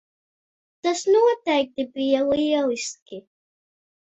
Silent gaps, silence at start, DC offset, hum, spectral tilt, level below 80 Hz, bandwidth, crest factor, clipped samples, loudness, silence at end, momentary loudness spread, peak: 3.02-3.06 s; 0.85 s; under 0.1%; none; -3 dB/octave; -64 dBFS; 8.4 kHz; 16 dB; under 0.1%; -22 LUFS; 0.95 s; 16 LU; -8 dBFS